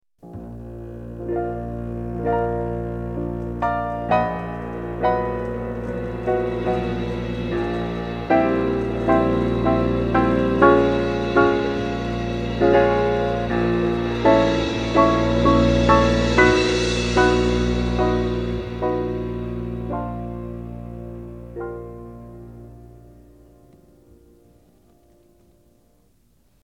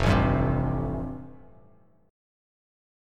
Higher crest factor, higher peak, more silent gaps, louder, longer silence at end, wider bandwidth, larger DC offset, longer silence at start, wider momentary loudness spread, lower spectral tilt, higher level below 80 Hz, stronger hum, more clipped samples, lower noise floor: about the same, 20 dB vs 20 dB; first, -2 dBFS vs -8 dBFS; neither; first, -21 LUFS vs -27 LUFS; first, 3.65 s vs 1.75 s; about the same, 10 kHz vs 11 kHz; neither; first, 0.25 s vs 0 s; about the same, 18 LU vs 19 LU; about the same, -6.5 dB/octave vs -7.5 dB/octave; about the same, -34 dBFS vs -36 dBFS; neither; neither; about the same, -60 dBFS vs -59 dBFS